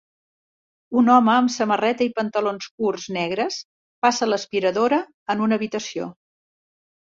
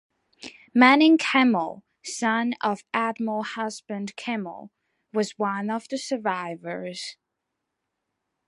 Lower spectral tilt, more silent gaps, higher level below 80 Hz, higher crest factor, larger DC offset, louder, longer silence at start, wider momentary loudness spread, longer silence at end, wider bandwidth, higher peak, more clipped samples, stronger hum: about the same, -4.5 dB/octave vs -4 dB/octave; first, 2.71-2.78 s, 3.65-4.02 s, 5.14-5.26 s vs none; first, -68 dBFS vs -78 dBFS; about the same, 18 dB vs 22 dB; neither; first, -21 LUFS vs -24 LUFS; first, 0.9 s vs 0.45 s; second, 11 LU vs 19 LU; second, 1 s vs 1.35 s; second, 7.6 kHz vs 11.5 kHz; about the same, -4 dBFS vs -2 dBFS; neither; neither